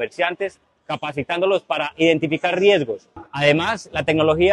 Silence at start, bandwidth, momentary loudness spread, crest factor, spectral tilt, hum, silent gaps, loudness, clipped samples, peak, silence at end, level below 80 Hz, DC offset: 0 s; 11 kHz; 12 LU; 16 dB; -5.5 dB/octave; none; none; -20 LUFS; under 0.1%; -4 dBFS; 0 s; -50 dBFS; under 0.1%